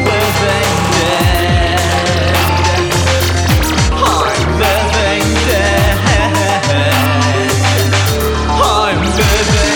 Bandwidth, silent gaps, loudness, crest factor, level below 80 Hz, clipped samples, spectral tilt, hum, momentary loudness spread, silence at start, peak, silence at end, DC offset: 20 kHz; none; -12 LUFS; 12 dB; -20 dBFS; under 0.1%; -4.5 dB/octave; none; 1 LU; 0 s; 0 dBFS; 0 s; under 0.1%